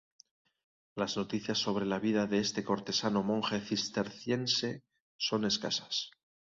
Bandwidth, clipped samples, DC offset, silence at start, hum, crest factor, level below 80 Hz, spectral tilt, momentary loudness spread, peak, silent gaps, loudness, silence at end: 7.8 kHz; under 0.1%; under 0.1%; 0.95 s; none; 20 dB; -70 dBFS; -4 dB/octave; 6 LU; -14 dBFS; 5.00-5.19 s; -33 LUFS; 0.4 s